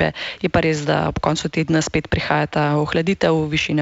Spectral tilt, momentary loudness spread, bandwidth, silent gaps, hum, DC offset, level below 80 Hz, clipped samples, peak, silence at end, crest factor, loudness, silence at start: -5.5 dB/octave; 3 LU; 8 kHz; none; none; under 0.1%; -40 dBFS; under 0.1%; -4 dBFS; 0 s; 14 dB; -19 LUFS; 0 s